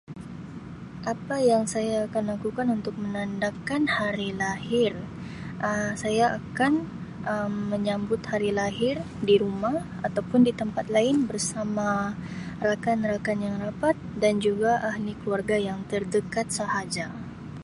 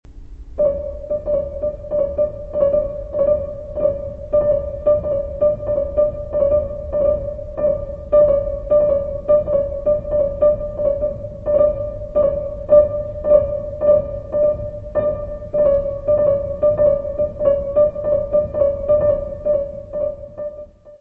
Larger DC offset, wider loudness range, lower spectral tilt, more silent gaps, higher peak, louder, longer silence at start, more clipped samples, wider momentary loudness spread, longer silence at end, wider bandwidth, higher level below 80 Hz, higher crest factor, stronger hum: neither; about the same, 3 LU vs 3 LU; second, -5 dB/octave vs -10.5 dB/octave; neither; second, -10 dBFS vs -2 dBFS; second, -27 LUFS vs -19 LUFS; about the same, 0.1 s vs 0.05 s; neither; first, 12 LU vs 9 LU; about the same, 0 s vs 0.05 s; first, 11.5 kHz vs 3 kHz; second, -54 dBFS vs -34 dBFS; about the same, 18 dB vs 16 dB; neither